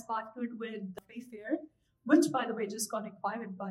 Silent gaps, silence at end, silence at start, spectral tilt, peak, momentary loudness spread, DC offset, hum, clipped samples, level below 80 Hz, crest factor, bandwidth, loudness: none; 0 s; 0 s; -4.5 dB/octave; -12 dBFS; 18 LU; under 0.1%; none; under 0.1%; -80 dBFS; 22 dB; 15.5 kHz; -33 LUFS